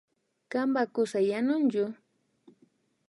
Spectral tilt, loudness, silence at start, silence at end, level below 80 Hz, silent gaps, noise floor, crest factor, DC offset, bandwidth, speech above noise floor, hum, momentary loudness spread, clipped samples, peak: -6 dB/octave; -29 LUFS; 0.5 s; 1.15 s; -84 dBFS; none; -67 dBFS; 14 dB; under 0.1%; 11.5 kHz; 40 dB; none; 7 LU; under 0.1%; -16 dBFS